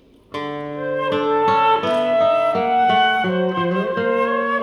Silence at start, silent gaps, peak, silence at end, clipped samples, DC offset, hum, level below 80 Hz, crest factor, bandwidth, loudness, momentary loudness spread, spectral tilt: 0.35 s; none; -4 dBFS; 0 s; under 0.1%; under 0.1%; none; -60 dBFS; 14 dB; 12 kHz; -18 LUFS; 11 LU; -6.5 dB/octave